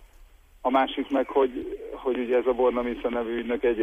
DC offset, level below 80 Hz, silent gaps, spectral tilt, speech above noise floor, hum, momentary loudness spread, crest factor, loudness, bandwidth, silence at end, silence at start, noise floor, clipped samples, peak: under 0.1%; -50 dBFS; none; -6 dB/octave; 27 dB; none; 8 LU; 16 dB; -26 LUFS; 8.2 kHz; 0 s; 0 s; -53 dBFS; under 0.1%; -10 dBFS